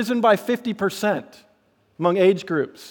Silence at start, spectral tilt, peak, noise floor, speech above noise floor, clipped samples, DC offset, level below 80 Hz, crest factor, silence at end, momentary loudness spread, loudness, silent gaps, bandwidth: 0 s; -5.5 dB/octave; -4 dBFS; -62 dBFS; 41 dB; under 0.1%; under 0.1%; -72 dBFS; 18 dB; 0 s; 7 LU; -21 LUFS; none; 19.5 kHz